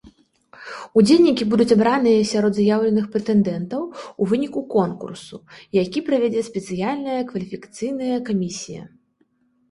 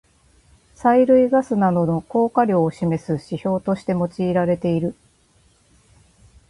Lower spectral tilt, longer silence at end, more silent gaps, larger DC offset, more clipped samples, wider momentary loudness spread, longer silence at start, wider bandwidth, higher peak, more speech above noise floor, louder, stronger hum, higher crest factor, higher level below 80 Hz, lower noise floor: second, -6 dB/octave vs -8.5 dB/octave; second, 0.85 s vs 1.55 s; neither; neither; neither; first, 18 LU vs 9 LU; second, 0.05 s vs 0.8 s; about the same, 11.5 kHz vs 11.5 kHz; about the same, -4 dBFS vs -4 dBFS; first, 45 dB vs 39 dB; about the same, -20 LUFS vs -20 LUFS; neither; about the same, 16 dB vs 16 dB; second, -58 dBFS vs -52 dBFS; first, -64 dBFS vs -58 dBFS